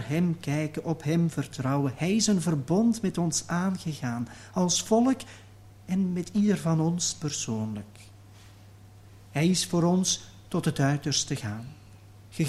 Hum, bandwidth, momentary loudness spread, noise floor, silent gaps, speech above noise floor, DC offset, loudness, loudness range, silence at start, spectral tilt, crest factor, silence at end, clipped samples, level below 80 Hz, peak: none; 14 kHz; 10 LU; -50 dBFS; none; 24 dB; under 0.1%; -27 LUFS; 3 LU; 0 s; -5 dB/octave; 18 dB; 0 s; under 0.1%; -58 dBFS; -10 dBFS